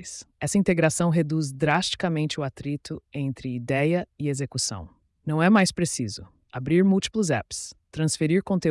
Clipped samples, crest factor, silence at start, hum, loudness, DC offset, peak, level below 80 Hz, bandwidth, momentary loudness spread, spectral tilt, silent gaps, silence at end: under 0.1%; 16 dB; 0 s; none; -25 LUFS; under 0.1%; -10 dBFS; -54 dBFS; 12 kHz; 14 LU; -5 dB/octave; none; 0 s